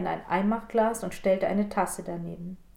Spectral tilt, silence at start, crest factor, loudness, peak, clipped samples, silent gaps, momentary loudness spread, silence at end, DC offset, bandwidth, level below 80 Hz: -6 dB/octave; 0 s; 16 dB; -28 LUFS; -12 dBFS; under 0.1%; none; 10 LU; 0.2 s; under 0.1%; 16.5 kHz; -52 dBFS